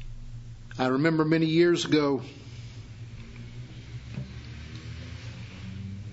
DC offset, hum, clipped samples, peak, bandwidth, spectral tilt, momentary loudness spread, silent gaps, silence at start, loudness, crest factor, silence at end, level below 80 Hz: under 0.1%; none; under 0.1%; -10 dBFS; 8 kHz; -6 dB/octave; 21 LU; none; 0 s; -26 LUFS; 20 dB; 0 s; -48 dBFS